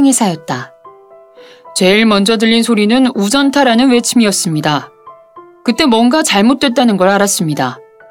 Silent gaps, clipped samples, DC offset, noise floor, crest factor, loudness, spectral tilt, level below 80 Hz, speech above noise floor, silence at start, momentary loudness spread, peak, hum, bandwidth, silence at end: none; under 0.1%; under 0.1%; -40 dBFS; 12 dB; -11 LUFS; -4 dB/octave; -50 dBFS; 29 dB; 0 s; 10 LU; 0 dBFS; none; 17 kHz; 0.3 s